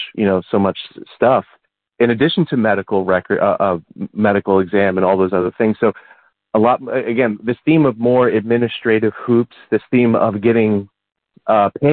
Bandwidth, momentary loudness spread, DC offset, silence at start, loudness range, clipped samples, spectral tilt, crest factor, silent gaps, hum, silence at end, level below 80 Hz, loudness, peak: 4.6 kHz; 5 LU; under 0.1%; 0 s; 1 LU; under 0.1%; -12 dB/octave; 14 dB; none; none; 0 s; -56 dBFS; -16 LUFS; -2 dBFS